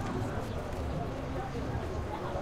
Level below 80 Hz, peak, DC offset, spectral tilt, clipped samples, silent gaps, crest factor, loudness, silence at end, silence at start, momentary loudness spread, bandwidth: -42 dBFS; -20 dBFS; under 0.1%; -7 dB/octave; under 0.1%; none; 14 dB; -37 LUFS; 0 s; 0 s; 2 LU; 15.5 kHz